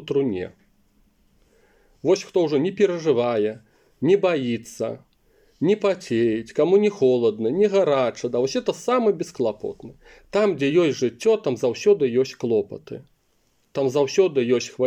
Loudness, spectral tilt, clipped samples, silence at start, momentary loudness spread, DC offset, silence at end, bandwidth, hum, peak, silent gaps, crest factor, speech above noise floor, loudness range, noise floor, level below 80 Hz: -22 LUFS; -6 dB/octave; under 0.1%; 0 s; 11 LU; under 0.1%; 0 s; 10.5 kHz; none; -6 dBFS; none; 16 dB; 45 dB; 3 LU; -66 dBFS; -64 dBFS